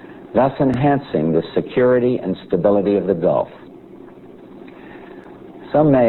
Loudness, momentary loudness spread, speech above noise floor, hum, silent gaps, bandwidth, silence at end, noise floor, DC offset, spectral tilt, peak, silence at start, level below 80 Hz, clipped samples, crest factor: -18 LUFS; 23 LU; 24 dB; none; none; 4.3 kHz; 0 s; -40 dBFS; under 0.1%; -10 dB/octave; -2 dBFS; 0.05 s; -48 dBFS; under 0.1%; 16 dB